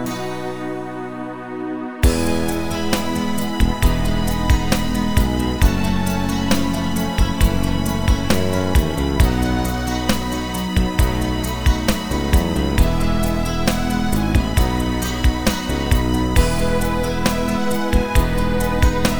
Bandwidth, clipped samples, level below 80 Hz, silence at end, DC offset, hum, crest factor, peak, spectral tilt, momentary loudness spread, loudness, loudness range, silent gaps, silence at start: over 20 kHz; under 0.1%; -22 dBFS; 0 s; under 0.1%; none; 16 dB; 0 dBFS; -5.5 dB/octave; 5 LU; -20 LUFS; 1 LU; none; 0 s